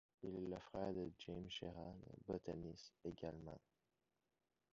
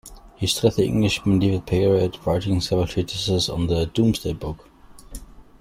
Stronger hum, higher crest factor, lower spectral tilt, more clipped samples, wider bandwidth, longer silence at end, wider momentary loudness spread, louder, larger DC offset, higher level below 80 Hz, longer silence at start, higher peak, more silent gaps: neither; about the same, 20 dB vs 18 dB; about the same, -5.5 dB/octave vs -5.5 dB/octave; neither; second, 7.4 kHz vs 16 kHz; first, 1.15 s vs 0.2 s; second, 9 LU vs 15 LU; second, -51 LUFS vs -22 LUFS; neither; second, -70 dBFS vs -42 dBFS; first, 0.2 s vs 0.05 s; second, -32 dBFS vs -4 dBFS; neither